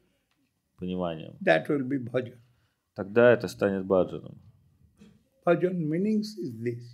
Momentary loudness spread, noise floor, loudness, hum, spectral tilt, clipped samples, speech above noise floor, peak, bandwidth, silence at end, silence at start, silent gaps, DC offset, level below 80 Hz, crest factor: 15 LU; -74 dBFS; -27 LUFS; none; -7 dB/octave; under 0.1%; 47 dB; -8 dBFS; 14 kHz; 0 s; 0.8 s; none; under 0.1%; -68 dBFS; 20 dB